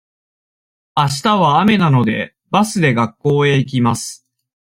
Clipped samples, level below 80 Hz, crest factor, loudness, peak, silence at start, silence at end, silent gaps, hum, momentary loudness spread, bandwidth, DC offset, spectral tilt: under 0.1%; -54 dBFS; 14 dB; -15 LUFS; -2 dBFS; 0.95 s; 0.45 s; none; none; 9 LU; 16 kHz; under 0.1%; -5.5 dB/octave